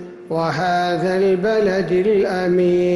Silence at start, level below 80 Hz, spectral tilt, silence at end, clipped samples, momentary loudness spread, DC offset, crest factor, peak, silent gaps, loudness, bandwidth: 0 s; -52 dBFS; -7 dB/octave; 0 s; under 0.1%; 4 LU; under 0.1%; 10 dB; -8 dBFS; none; -18 LUFS; 11.5 kHz